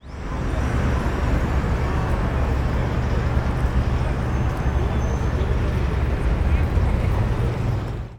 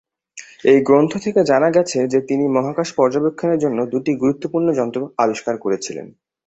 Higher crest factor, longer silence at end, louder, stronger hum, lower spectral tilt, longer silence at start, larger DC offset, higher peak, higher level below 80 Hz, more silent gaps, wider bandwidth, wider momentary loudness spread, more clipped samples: about the same, 12 dB vs 16 dB; second, 0 s vs 0.4 s; second, -23 LUFS vs -18 LUFS; neither; first, -7.5 dB/octave vs -6 dB/octave; second, 0.05 s vs 0.35 s; neither; second, -8 dBFS vs -2 dBFS; first, -24 dBFS vs -60 dBFS; neither; first, 10 kHz vs 8.2 kHz; second, 2 LU vs 8 LU; neither